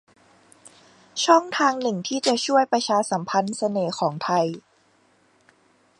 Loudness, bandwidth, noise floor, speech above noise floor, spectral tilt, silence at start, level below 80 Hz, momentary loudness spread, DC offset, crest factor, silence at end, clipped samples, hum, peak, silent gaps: -22 LUFS; 11.5 kHz; -61 dBFS; 39 dB; -4 dB/octave; 0.65 s; -74 dBFS; 7 LU; under 0.1%; 22 dB; 1.4 s; under 0.1%; none; -2 dBFS; none